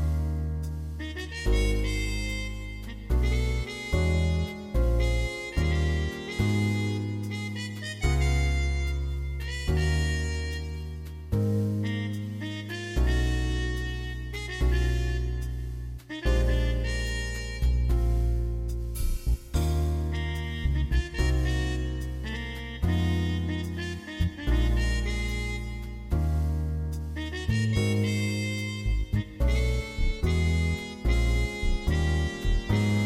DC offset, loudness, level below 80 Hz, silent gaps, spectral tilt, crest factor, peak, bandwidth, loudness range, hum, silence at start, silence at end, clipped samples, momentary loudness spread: under 0.1%; -29 LUFS; -30 dBFS; none; -6 dB/octave; 14 dB; -12 dBFS; 15 kHz; 2 LU; none; 0 s; 0 s; under 0.1%; 8 LU